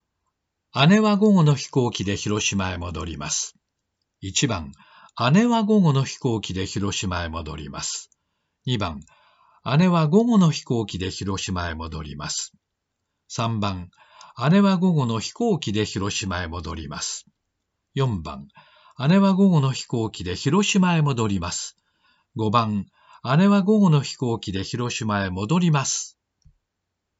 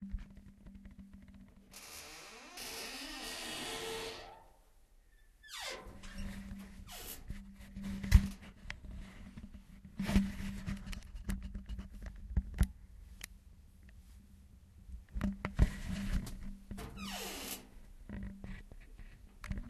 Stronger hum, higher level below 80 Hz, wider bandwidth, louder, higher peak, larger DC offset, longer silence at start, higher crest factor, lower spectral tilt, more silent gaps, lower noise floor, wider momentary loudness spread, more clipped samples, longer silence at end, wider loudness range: neither; second, -52 dBFS vs -44 dBFS; second, 8 kHz vs 13.5 kHz; first, -22 LUFS vs -41 LUFS; first, -4 dBFS vs -10 dBFS; neither; first, 0.75 s vs 0 s; second, 20 dB vs 30 dB; about the same, -5.5 dB/octave vs -5 dB/octave; neither; first, -80 dBFS vs -64 dBFS; second, 15 LU vs 23 LU; neither; first, 1.1 s vs 0 s; about the same, 7 LU vs 9 LU